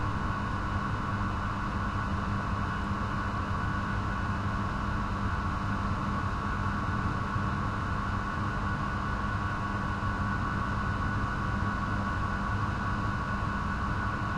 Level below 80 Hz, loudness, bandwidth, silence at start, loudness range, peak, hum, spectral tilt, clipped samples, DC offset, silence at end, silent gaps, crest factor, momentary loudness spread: -38 dBFS; -32 LUFS; 10.5 kHz; 0 s; 1 LU; -18 dBFS; none; -7 dB/octave; under 0.1%; under 0.1%; 0 s; none; 12 dB; 1 LU